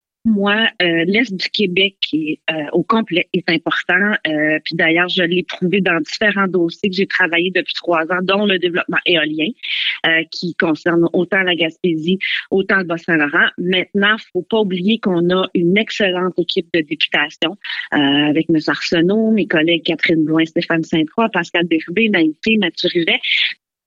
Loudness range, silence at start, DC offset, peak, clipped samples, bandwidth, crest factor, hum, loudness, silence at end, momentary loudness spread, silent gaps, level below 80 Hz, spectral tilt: 1 LU; 0.25 s; under 0.1%; -2 dBFS; under 0.1%; 7.6 kHz; 14 dB; none; -16 LUFS; 0.3 s; 5 LU; none; -58 dBFS; -5.5 dB/octave